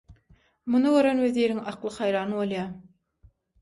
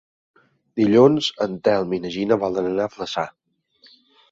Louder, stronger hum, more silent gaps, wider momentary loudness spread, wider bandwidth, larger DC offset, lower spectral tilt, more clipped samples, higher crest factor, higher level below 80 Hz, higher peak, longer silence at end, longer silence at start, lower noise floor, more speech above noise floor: second, -25 LUFS vs -20 LUFS; neither; neither; first, 15 LU vs 12 LU; first, 11.5 kHz vs 7.8 kHz; neither; about the same, -6 dB/octave vs -6 dB/octave; neither; about the same, 16 dB vs 18 dB; about the same, -62 dBFS vs -58 dBFS; second, -10 dBFS vs -2 dBFS; second, 0.8 s vs 1 s; second, 0.1 s vs 0.75 s; first, -61 dBFS vs -56 dBFS; about the same, 37 dB vs 37 dB